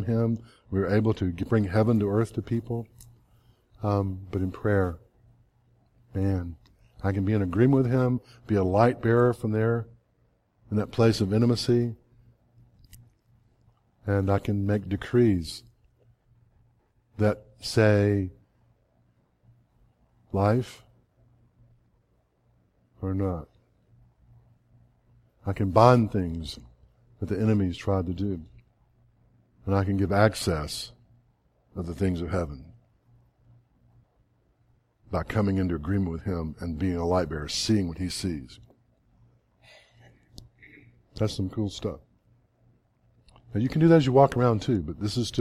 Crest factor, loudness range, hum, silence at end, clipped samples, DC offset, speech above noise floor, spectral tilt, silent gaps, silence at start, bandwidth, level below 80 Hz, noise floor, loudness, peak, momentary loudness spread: 24 dB; 11 LU; none; 0 s; under 0.1%; under 0.1%; 43 dB; -7 dB/octave; none; 0 s; 13.5 kHz; -50 dBFS; -68 dBFS; -26 LUFS; -2 dBFS; 15 LU